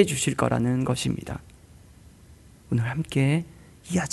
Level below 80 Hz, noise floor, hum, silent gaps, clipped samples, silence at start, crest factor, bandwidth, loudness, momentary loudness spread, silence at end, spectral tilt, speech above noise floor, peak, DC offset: -50 dBFS; -51 dBFS; none; none; under 0.1%; 0 s; 22 dB; 12 kHz; -26 LUFS; 15 LU; 0 s; -5.5 dB/octave; 27 dB; -4 dBFS; under 0.1%